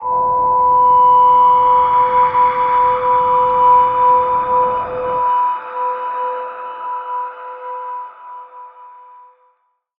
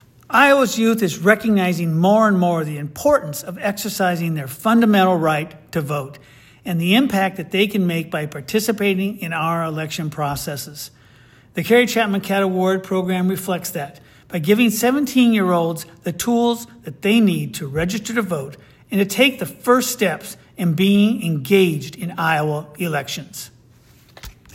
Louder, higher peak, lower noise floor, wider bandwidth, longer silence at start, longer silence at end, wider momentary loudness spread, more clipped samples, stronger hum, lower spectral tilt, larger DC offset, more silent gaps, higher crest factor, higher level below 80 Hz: first, -13 LUFS vs -19 LUFS; about the same, -2 dBFS vs 0 dBFS; first, -62 dBFS vs -50 dBFS; second, 3.9 kHz vs 16.5 kHz; second, 0 s vs 0.3 s; first, 1.1 s vs 0.25 s; first, 18 LU vs 13 LU; neither; neither; first, -7.5 dB/octave vs -5 dB/octave; neither; neither; second, 12 dB vs 18 dB; about the same, -50 dBFS vs -54 dBFS